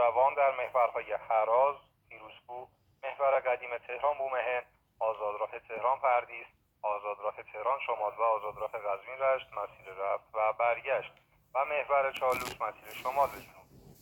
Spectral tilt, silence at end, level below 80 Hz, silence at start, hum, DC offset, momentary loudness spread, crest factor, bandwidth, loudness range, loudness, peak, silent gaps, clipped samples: -3.5 dB/octave; 0.4 s; -70 dBFS; 0 s; none; under 0.1%; 14 LU; 18 dB; 19 kHz; 2 LU; -32 LUFS; -14 dBFS; none; under 0.1%